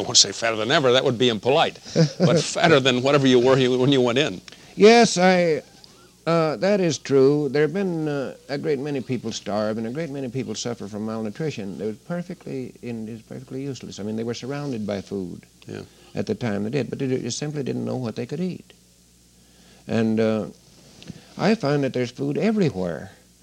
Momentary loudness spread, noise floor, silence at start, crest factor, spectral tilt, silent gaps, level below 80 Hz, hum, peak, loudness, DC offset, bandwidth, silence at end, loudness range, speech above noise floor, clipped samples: 16 LU; -55 dBFS; 0 s; 22 dB; -4.5 dB/octave; none; -60 dBFS; none; 0 dBFS; -22 LUFS; under 0.1%; 13 kHz; 0.3 s; 13 LU; 33 dB; under 0.1%